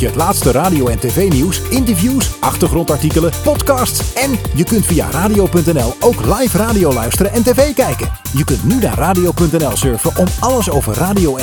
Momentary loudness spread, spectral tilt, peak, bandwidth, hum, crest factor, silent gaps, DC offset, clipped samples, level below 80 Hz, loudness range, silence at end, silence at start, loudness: 3 LU; -5 dB/octave; 0 dBFS; 19.5 kHz; none; 12 dB; none; under 0.1%; under 0.1%; -24 dBFS; 1 LU; 0 s; 0 s; -13 LUFS